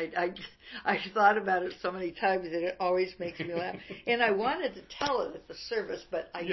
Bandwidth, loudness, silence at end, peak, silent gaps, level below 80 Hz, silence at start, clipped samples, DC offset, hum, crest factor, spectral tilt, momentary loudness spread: 6.2 kHz; -31 LUFS; 0 s; -10 dBFS; none; -64 dBFS; 0 s; under 0.1%; under 0.1%; none; 20 dB; -5 dB/octave; 12 LU